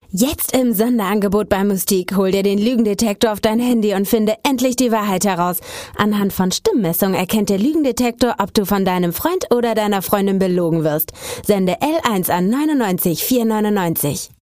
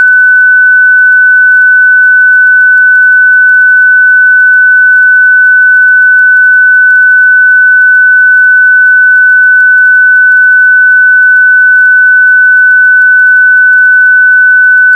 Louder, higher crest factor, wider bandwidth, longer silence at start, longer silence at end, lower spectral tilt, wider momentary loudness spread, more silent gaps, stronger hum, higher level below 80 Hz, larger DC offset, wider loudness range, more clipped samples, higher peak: second, -17 LUFS vs -2 LUFS; first, 16 dB vs 4 dB; first, 15.5 kHz vs 1.7 kHz; first, 0.15 s vs 0 s; first, 0.3 s vs 0 s; first, -5 dB/octave vs 7 dB/octave; first, 3 LU vs 0 LU; neither; neither; first, -46 dBFS vs under -90 dBFS; first, 0.2% vs under 0.1%; about the same, 1 LU vs 0 LU; second, under 0.1% vs 4%; about the same, -2 dBFS vs 0 dBFS